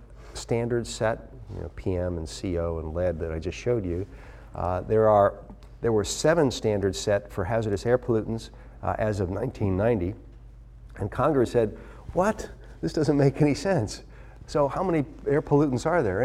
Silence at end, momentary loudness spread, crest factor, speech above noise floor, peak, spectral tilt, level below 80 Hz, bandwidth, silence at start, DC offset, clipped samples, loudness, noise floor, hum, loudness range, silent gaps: 0 s; 14 LU; 18 dB; 21 dB; -8 dBFS; -6.5 dB/octave; -44 dBFS; 14 kHz; 0 s; under 0.1%; under 0.1%; -26 LUFS; -46 dBFS; none; 5 LU; none